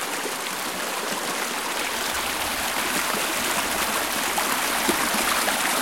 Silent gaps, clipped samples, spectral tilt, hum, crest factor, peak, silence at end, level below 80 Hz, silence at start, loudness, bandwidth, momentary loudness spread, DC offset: none; under 0.1%; -1 dB/octave; none; 20 dB; -6 dBFS; 0 s; -52 dBFS; 0 s; -23 LUFS; 17 kHz; 6 LU; 0.2%